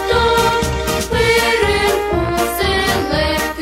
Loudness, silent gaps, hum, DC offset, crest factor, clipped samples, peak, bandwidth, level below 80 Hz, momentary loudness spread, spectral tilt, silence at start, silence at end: -15 LUFS; none; none; under 0.1%; 14 dB; under 0.1%; -2 dBFS; 16.5 kHz; -28 dBFS; 5 LU; -4 dB/octave; 0 s; 0 s